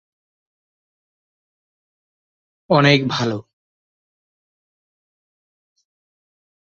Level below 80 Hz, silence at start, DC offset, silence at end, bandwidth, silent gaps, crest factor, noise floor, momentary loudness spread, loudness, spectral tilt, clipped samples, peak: -62 dBFS; 2.7 s; under 0.1%; 3.25 s; 7.6 kHz; none; 24 dB; under -90 dBFS; 12 LU; -17 LUFS; -6 dB/octave; under 0.1%; -2 dBFS